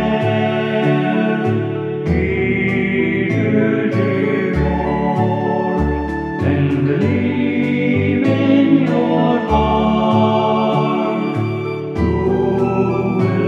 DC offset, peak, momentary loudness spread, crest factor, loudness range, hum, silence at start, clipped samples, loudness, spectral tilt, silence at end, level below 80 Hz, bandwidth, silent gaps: under 0.1%; -2 dBFS; 5 LU; 14 dB; 3 LU; none; 0 s; under 0.1%; -16 LUFS; -8.5 dB/octave; 0 s; -32 dBFS; 7.6 kHz; none